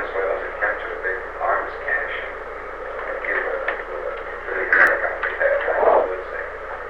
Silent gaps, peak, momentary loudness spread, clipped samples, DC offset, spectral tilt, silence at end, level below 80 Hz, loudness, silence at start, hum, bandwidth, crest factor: none; -4 dBFS; 13 LU; under 0.1%; 0.4%; -5 dB/octave; 0 s; -44 dBFS; -22 LUFS; 0 s; none; 12 kHz; 18 dB